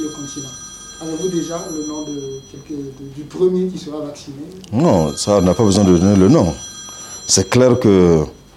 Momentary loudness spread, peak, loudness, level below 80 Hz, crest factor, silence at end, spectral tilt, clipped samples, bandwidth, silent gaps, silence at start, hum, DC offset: 19 LU; 0 dBFS; -15 LUFS; -44 dBFS; 16 dB; 0.2 s; -5.5 dB/octave; under 0.1%; 13.5 kHz; none; 0 s; none; under 0.1%